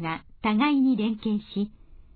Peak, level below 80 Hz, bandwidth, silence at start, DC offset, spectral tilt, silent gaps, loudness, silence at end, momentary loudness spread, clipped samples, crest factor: -10 dBFS; -54 dBFS; 4.7 kHz; 0 s; under 0.1%; -9.5 dB/octave; none; -26 LUFS; 0.2 s; 11 LU; under 0.1%; 16 dB